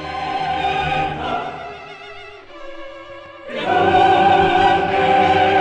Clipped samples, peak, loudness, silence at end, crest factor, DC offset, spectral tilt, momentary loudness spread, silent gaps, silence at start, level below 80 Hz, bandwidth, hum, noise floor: under 0.1%; -4 dBFS; -16 LUFS; 0 s; 14 dB; under 0.1%; -5.5 dB/octave; 23 LU; none; 0 s; -44 dBFS; 9 kHz; none; -37 dBFS